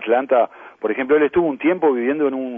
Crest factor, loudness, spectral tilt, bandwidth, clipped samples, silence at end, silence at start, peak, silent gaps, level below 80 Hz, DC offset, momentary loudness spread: 14 dB; -19 LUFS; -9 dB/octave; 3.6 kHz; under 0.1%; 0 s; 0 s; -4 dBFS; none; -58 dBFS; under 0.1%; 8 LU